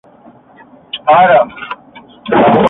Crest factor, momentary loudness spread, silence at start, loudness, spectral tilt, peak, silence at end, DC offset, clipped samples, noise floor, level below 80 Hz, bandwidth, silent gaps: 12 dB; 20 LU; 0.95 s; -10 LUFS; -8 dB/octave; 0 dBFS; 0 s; under 0.1%; under 0.1%; -41 dBFS; -48 dBFS; 4 kHz; none